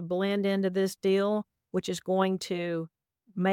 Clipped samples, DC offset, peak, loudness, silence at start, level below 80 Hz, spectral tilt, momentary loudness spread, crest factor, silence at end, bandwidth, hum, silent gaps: under 0.1%; under 0.1%; -14 dBFS; -29 LUFS; 0 s; -74 dBFS; -6 dB/octave; 8 LU; 14 dB; 0 s; 16.5 kHz; none; none